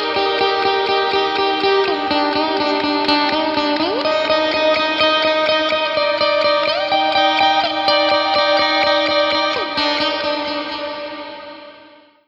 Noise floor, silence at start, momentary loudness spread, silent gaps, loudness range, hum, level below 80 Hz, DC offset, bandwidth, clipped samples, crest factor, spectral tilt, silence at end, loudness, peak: -45 dBFS; 0 s; 7 LU; none; 2 LU; none; -54 dBFS; under 0.1%; 7.6 kHz; under 0.1%; 16 dB; -3.5 dB/octave; 0.45 s; -16 LUFS; 0 dBFS